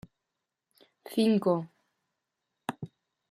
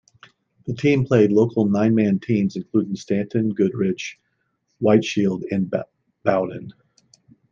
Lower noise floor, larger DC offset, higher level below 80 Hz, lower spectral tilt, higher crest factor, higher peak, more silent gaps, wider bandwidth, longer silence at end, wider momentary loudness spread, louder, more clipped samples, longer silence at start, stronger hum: first, -86 dBFS vs -71 dBFS; neither; second, -76 dBFS vs -62 dBFS; about the same, -7 dB/octave vs -7.5 dB/octave; about the same, 20 dB vs 18 dB; second, -14 dBFS vs -4 dBFS; neither; first, 14.5 kHz vs 7.4 kHz; second, 0.45 s vs 0.8 s; first, 21 LU vs 12 LU; second, -30 LUFS vs -21 LUFS; neither; first, 1.05 s vs 0.65 s; neither